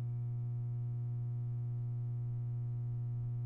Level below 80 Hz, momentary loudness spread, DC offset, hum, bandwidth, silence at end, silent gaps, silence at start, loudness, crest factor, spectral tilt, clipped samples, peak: -60 dBFS; 0 LU; under 0.1%; 60 Hz at -40 dBFS; 1.4 kHz; 0 s; none; 0 s; -40 LUFS; 4 dB; -12 dB/octave; under 0.1%; -34 dBFS